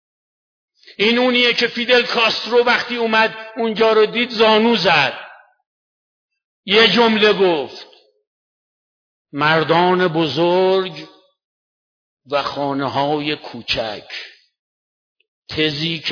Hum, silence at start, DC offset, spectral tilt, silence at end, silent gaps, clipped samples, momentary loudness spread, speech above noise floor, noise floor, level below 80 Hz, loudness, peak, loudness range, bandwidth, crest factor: none; 1 s; under 0.1%; -5 dB/octave; 0 s; 5.66-6.29 s, 6.44-6.63 s, 8.27-9.25 s, 11.44-12.17 s, 14.59-15.16 s, 15.28-15.42 s; under 0.1%; 15 LU; over 74 dB; under -90 dBFS; -56 dBFS; -16 LUFS; -2 dBFS; 8 LU; 5.4 kHz; 16 dB